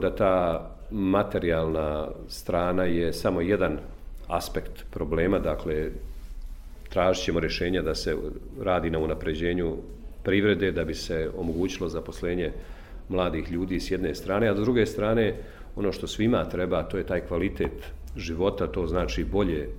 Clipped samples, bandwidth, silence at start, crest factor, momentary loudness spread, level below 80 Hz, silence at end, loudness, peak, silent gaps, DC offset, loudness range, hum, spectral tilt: under 0.1%; 16 kHz; 0 s; 18 dB; 13 LU; -38 dBFS; 0 s; -27 LUFS; -8 dBFS; none; under 0.1%; 3 LU; none; -6 dB/octave